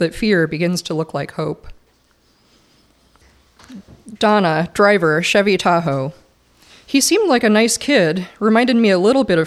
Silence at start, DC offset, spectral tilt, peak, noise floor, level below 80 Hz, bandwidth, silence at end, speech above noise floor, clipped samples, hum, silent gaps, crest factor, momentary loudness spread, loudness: 0 s; under 0.1%; -4.5 dB/octave; -2 dBFS; -57 dBFS; -48 dBFS; 15 kHz; 0 s; 42 dB; under 0.1%; none; none; 16 dB; 10 LU; -16 LUFS